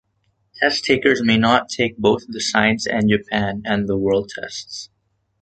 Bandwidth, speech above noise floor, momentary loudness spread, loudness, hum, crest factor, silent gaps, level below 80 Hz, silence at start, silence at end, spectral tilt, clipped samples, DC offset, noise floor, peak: 9.2 kHz; 48 dB; 13 LU; -19 LUFS; none; 20 dB; none; -50 dBFS; 0.55 s; 0.55 s; -4.5 dB/octave; under 0.1%; under 0.1%; -67 dBFS; 0 dBFS